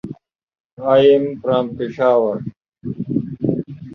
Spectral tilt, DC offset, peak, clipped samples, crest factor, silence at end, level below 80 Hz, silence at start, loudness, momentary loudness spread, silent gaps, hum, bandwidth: -9 dB/octave; under 0.1%; -2 dBFS; under 0.1%; 16 dB; 0 s; -54 dBFS; 0.05 s; -18 LUFS; 18 LU; 0.43-0.47 s, 0.60-0.77 s, 2.57-2.61 s; none; 6 kHz